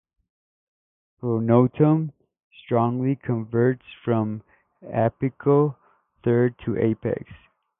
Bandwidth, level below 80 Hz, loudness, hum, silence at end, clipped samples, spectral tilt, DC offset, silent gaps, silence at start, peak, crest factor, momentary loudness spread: 3.8 kHz; -58 dBFS; -23 LUFS; none; 0.45 s; under 0.1%; -13 dB/octave; under 0.1%; 2.44-2.51 s; 1.25 s; -4 dBFS; 20 dB; 11 LU